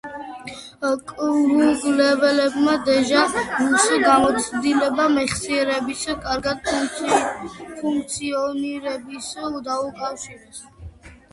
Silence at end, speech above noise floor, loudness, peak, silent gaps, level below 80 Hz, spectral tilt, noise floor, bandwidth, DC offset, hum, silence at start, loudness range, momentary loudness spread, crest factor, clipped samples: 0.2 s; 21 dB; -20 LUFS; -2 dBFS; none; -50 dBFS; -3 dB/octave; -41 dBFS; 11.5 kHz; under 0.1%; none; 0.05 s; 9 LU; 17 LU; 18 dB; under 0.1%